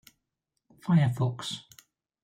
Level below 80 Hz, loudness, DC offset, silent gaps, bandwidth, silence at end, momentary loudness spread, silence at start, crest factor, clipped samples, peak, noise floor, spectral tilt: -66 dBFS; -28 LUFS; under 0.1%; none; 15 kHz; 0.6 s; 16 LU; 0.85 s; 16 dB; under 0.1%; -14 dBFS; -83 dBFS; -6.5 dB/octave